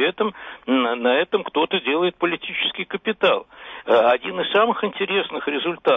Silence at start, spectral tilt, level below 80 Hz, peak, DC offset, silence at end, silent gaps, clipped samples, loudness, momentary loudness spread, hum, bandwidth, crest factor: 0 s; -6.5 dB/octave; -64 dBFS; -6 dBFS; under 0.1%; 0 s; none; under 0.1%; -21 LUFS; 7 LU; none; 5.8 kHz; 14 dB